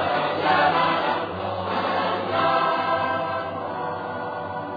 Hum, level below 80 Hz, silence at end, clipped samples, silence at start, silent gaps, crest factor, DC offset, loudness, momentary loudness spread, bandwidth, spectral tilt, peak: none; -64 dBFS; 0 s; under 0.1%; 0 s; none; 16 dB; under 0.1%; -23 LUFS; 10 LU; 5 kHz; -7 dB/octave; -8 dBFS